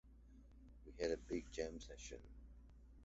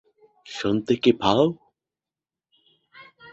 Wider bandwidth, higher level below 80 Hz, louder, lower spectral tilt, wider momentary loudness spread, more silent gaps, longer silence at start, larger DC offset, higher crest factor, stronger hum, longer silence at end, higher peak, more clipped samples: about the same, 8 kHz vs 8 kHz; about the same, -60 dBFS vs -58 dBFS; second, -48 LUFS vs -22 LUFS; about the same, -5 dB/octave vs -6 dB/octave; first, 21 LU vs 16 LU; neither; second, 0.05 s vs 0.5 s; neither; about the same, 22 dB vs 22 dB; neither; second, 0 s vs 0.3 s; second, -28 dBFS vs -4 dBFS; neither